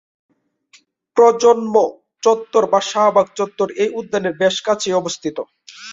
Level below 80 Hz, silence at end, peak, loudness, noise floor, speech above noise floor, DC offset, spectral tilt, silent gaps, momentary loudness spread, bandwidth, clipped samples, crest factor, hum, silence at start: -64 dBFS; 0 s; -2 dBFS; -17 LUFS; -54 dBFS; 38 dB; under 0.1%; -3.5 dB/octave; none; 11 LU; 7.8 kHz; under 0.1%; 16 dB; none; 1.15 s